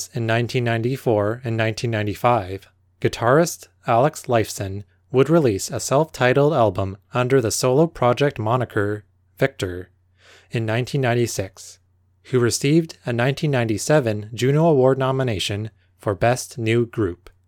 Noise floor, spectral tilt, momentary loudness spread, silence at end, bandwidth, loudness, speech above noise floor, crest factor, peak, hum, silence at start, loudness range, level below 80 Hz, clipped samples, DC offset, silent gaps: -53 dBFS; -5.5 dB/octave; 11 LU; 0.35 s; 18 kHz; -21 LUFS; 33 dB; 18 dB; -4 dBFS; none; 0 s; 5 LU; -54 dBFS; under 0.1%; under 0.1%; none